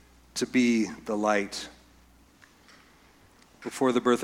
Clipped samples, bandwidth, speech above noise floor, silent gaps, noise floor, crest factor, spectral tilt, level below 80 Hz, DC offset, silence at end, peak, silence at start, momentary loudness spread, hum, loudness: under 0.1%; 15 kHz; 32 dB; none; -58 dBFS; 20 dB; -4 dB/octave; -62 dBFS; under 0.1%; 0 s; -10 dBFS; 0.35 s; 15 LU; none; -27 LUFS